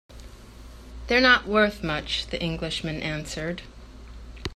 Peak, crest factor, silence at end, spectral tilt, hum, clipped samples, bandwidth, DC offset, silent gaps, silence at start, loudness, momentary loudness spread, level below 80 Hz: -6 dBFS; 22 dB; 0 s; -4.5 dB/octave; none; under 0.1%; 14 kHz; under 0.1%; none; 0.1 s; -24 LUFS; 26 LU; -42 dBFS